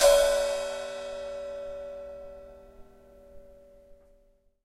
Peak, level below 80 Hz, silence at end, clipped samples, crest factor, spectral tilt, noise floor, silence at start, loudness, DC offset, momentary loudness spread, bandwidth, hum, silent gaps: -8 dBFS; -50 dBFS; 0.7 s; under 0.1%; 22 dB; -0.5 dB/octave; -64 dBFS; 0 s; -29 LUFS; under 0.1%; 23 LU; 16 kHz; none; none